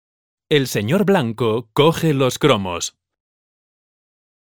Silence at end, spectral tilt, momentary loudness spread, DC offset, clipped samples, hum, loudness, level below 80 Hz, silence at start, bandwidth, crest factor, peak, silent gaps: 1.6 s; -5 dB/octave; 7 LU; 0.3%; under 0.1%; none; -18 LUFS; -54 dBFS; 0.5 s; 19 kHz; 18 dB; -2 dBFS; none